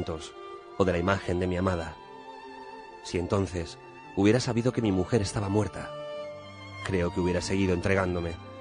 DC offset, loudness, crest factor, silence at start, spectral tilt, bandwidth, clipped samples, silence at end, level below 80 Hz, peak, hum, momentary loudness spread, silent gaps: under 0.1%; -29 LUFS; 20 dB; 0 s; -6 dB/octave; 10.5 kHz; under 0.1%; 0 s; -50 dBFS; -10 dBFS; none; 18 LU; none